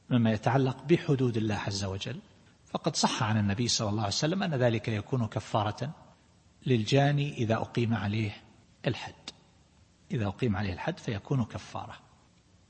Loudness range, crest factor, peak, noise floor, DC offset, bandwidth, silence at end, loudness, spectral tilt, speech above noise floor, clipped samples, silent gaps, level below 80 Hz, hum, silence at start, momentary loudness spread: 6 LU; 20 dB; -10 dBFS; -62 dBFS; under 0.1%; 8.8 kHz; 0.7 s; -30 LUFS; -5.5 dB/octave; 33 dB; under 0.1%; none; -60 dBFS; none; 0.1 s; 13 LU